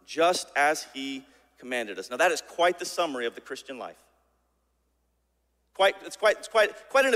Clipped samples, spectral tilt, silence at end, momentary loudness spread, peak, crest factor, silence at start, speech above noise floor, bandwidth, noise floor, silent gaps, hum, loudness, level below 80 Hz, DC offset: under 0.1%; -1.5 dB/octave; 0 s; 16 LU; -10 dBFS; 20 dB; 0.1 s; 47 dB; 16 kHz; -73 dBFS; none; none; -26 LUFS; -70 dBFS; under 0.1%